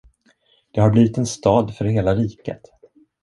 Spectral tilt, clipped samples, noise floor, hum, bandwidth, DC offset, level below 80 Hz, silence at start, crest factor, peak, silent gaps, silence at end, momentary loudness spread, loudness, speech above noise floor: -7 dB/octave; under 0.1%; -60 dBFS; none; 11.5 kHz; under 0.1%; -44 dBFS; 0.75 s; 18 dB; -2 dBFS; none; 0.65 s; 17 LU; -19 LUFS; 42 dB